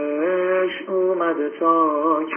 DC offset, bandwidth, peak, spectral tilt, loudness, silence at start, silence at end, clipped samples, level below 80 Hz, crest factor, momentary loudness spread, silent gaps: under 0.1%; 3.3 kHz; -6 dBFS; -9 dB/octave; -20 LUFS; 0 s; 0 s; under 0.1%; -80 dBFS; 14 dB; 4 LU; none